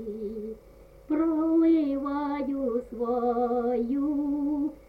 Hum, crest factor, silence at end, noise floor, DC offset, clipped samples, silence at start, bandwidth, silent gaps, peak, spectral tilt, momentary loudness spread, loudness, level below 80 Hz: none; 12 dB; 0.1 s; -51 dBFS; under 0.1%; under 0.1%; 0 s; 4.8 kHz; none; -14 dBFS; -8.5 dB/octave; 12 LU; -27 LUFS; -54 dBFS